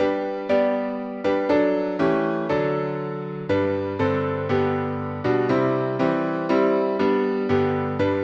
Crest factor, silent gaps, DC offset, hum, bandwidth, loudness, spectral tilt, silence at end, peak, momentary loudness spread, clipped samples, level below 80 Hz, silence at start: 14 dB; none; under 0.1%; none; 7.2 kHz; -23 LUFS; -8 dB/octave; 0 s; -8 dBFS; 6 LU; under 0.1%; -58 dBFS; 0 s